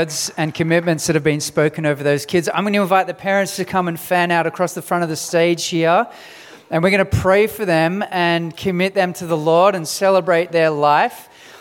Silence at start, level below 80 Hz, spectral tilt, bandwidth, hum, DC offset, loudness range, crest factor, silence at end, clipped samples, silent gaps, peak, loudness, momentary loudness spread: 0 s; -46 dBFS; -4.5 dB/octave; 18.5 kHz; none; under 0.1%; 2 LU; 16 dB; 0.05 s; under 0.1%; none; -2 dBFS; -17 LUFS; 6 LU